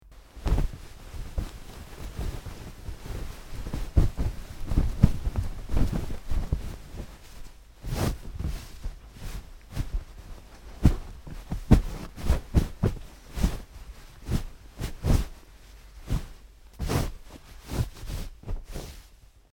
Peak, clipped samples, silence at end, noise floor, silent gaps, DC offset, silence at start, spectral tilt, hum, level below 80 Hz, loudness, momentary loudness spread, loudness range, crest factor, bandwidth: -2 dBFS; under 0.1%; 0.35 s; -53 dBFS; none; under 0.1%; 0.05 s; -6.5 dB/octave; none; -32 dBFS; -31 LUFS; 21 LU; 8 LU; 26 dB; 17.5 kHz